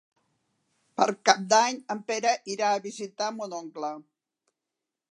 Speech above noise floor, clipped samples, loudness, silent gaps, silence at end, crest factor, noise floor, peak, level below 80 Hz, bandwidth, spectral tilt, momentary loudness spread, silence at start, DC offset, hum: 60 dB; under 0.1%; -27 LUFS; none; 1.15 s; 26 dB; -87 dBFS; -2 dBFS; -86 dBFS; 11 kHz; -2 dB/octave; 15 LU; 1 s; under 0.1%; none